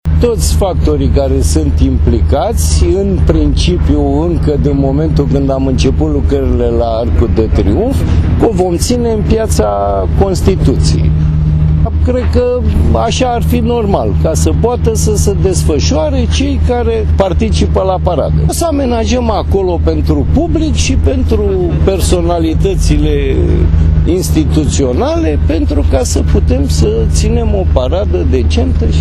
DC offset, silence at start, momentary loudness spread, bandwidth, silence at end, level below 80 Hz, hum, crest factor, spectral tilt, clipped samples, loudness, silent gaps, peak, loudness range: under 0.1%; 0.05 s; 2 LU; 13.5 kHz; 0 s; -14 dBFS; none; 10 dB; -6.5 dB/octave; under 0.1%; -11 LUFS; none; 0 dBFS; 1 LU